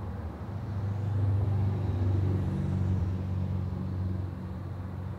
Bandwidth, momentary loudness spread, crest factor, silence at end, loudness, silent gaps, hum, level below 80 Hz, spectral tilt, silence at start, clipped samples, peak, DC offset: 4.7 kHz; 10 LU; 12 dB; 0 s; -32 LUFS; none; none; -46 dBFS; -9.5 dB/octave; 0 s; under 0.1%; -18 dBFS; under 0.1%